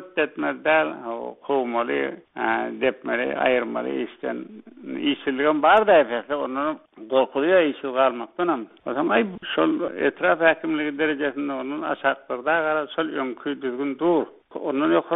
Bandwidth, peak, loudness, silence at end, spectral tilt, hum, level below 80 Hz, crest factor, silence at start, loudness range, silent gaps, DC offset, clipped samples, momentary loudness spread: 4 kHz; -2 dBFS; -23 LUFS; 0 s; -2.5 dB/octave; none; -64 dBFS; 20 dB; 0 s; 4 LU; none; under 0.1%; under 0.1%; 10 LU